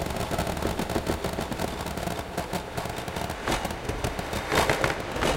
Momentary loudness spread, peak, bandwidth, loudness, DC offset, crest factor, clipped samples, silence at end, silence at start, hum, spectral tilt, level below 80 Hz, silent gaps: 8 LU; -8 dBFS; 17 kHz; -29 LUFS; under 0.1%; 22 dB; under 0.1%; 0 s; 0 s; none; -4.5 dB/octave; -40 dBFS; none